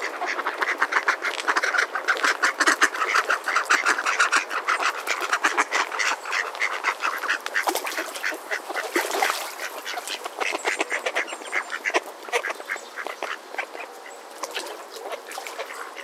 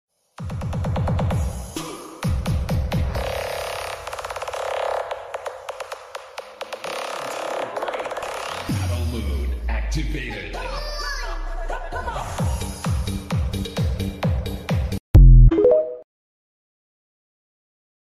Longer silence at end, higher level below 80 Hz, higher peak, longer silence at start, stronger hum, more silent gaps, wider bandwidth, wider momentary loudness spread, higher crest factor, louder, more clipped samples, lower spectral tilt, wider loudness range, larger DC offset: second, 0 s vs 2 s; second, -84 dBFS vs -24 dBFS; about the same, -2 dBFS vs -4 dBFS; second, 0 s vs 0.4 s; neither; second, none vs 15.00-15.14 s; first, 16 kHz vs 13.5 kHz; about the same, 13 LU vs 15 LU; first, 24 dB vs 18 dB; about the same, -24 LUFS vs -24 LUFS; neither; second, 2 dB/octave vs -6 dB/octave; about the same, 9 LU vs 11 LU; neither